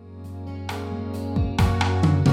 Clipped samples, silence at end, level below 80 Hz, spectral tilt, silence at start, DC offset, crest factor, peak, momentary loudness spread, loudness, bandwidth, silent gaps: under 0.1%; 0 s; -36 dBFS; -7 dB/octave; 0 s; under 0.1%; 16 dB; -8 dBFS; 15 LU; -24 LUFS; 15 kHz; none